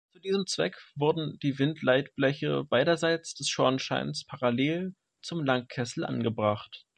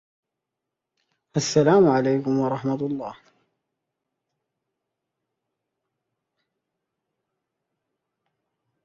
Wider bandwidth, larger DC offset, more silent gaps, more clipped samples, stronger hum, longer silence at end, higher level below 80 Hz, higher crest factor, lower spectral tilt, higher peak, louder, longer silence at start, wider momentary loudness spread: first, 11 kHz vs 7.8 kHz; neither; neither; neither; neither; second, 0.2 s vs 5.7 s; about the same, -68 dBFS vs -66 dBFS; about the same, 20 dB vs 22 dB; about the same, -5 dB/octave vs -6 dB/octave; second, -10 dBFS vs -6 dBFS; second, -29 LUFS vs -21 LUFS; second, 0.25 s vs 1.35 s; second, 8 LU vs 13 LU